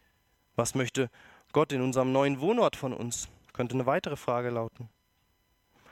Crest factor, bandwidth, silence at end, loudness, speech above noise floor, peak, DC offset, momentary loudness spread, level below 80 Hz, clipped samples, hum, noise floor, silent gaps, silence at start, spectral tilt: 20 dB; 16.5 kHz; 1.05 s; -30 LUFS; 43 dB; -10 dBFS; under 0.1%; 11 LU; -62 dBFS; under 0.1%; none; -72 dBFS; none; 0.6 s; -5 dB/octave